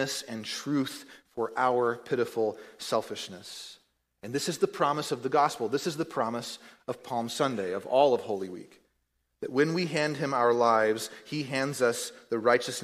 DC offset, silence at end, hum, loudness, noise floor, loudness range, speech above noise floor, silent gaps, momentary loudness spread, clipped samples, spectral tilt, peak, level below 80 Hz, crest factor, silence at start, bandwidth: under 0.1%; 0 s; none; -29 LUFS; -77 dBFS; 4 LU; 48 dB; none; 15 LU; under 0.1%; -4.5 dB/octave; -10 dBFS; -74 dBFS; 20 dB; 0 s; 15.5 kHz